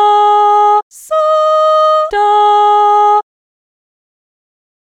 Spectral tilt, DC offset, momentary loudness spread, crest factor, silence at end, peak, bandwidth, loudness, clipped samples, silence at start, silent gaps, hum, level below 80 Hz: -1 dB/octave; under 0.1%; 6 LU; 10 dB; 1.75 s; -2 dBFS; 12.5 kHz; -10 LUFS; under 0.1%; 0 s; 0.83-0.91 s; none; -54 dBFS